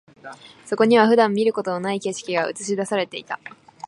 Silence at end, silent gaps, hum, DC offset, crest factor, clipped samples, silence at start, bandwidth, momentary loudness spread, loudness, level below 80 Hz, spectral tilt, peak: 0.4 s; none; none; under 0.1%; 20 dB; under 0.1%; 0.25 s; 11 kHz; 18 LU; -21 LUFS; -74 dBFS; -4.5 dB/octave; -2 dBFS